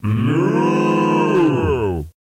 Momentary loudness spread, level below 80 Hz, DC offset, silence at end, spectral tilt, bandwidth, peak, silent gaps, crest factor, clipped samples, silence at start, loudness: 4 LU; -38 dBFS; under 0.1%; 0.1 s; -8 dB/octave; 11 kHz; -6 dBFS; none; 10 dB; under 0.1%; 0 s; -17 LUFS